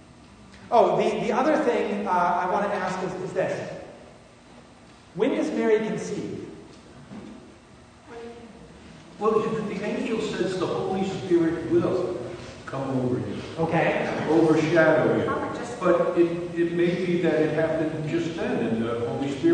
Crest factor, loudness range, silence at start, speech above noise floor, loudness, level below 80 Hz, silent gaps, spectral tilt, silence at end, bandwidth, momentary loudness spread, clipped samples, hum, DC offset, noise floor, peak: 18 dB; 8 LU; 0.1 s; 26 dB; -25 LUFS; -56 dBFS; none; -6.5 dB/octave; 0 s; 9.6 kHz; 20 LU; under 0.1%; none; under 0.1%; -50 dBFS; -6 dBFS